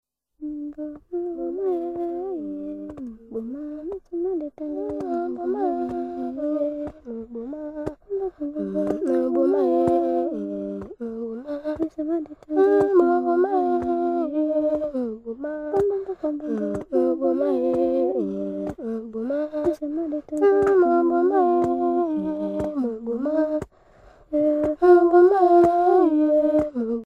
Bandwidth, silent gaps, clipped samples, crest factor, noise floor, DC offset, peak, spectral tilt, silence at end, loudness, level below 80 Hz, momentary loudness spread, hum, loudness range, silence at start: 5.2 kHz; none; under 0.1%; 18 dB; -52 dBFS; under 0.1%; -4 dBFS; -8.5 dB/octave; 0 s; -23 LUFS; -54 dBFS; 15 LU; none; 11 LU; 0.4 s